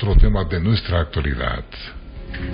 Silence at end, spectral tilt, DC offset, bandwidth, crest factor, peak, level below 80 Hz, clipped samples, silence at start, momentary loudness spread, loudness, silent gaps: 0 s; -11.5 dB/octave; under 0.1%; 5.2 kHz; 16 dB; -2 dBFS; -22 dBFS; under 0.1%; 0 s; 17 LU; -21 LUFS; none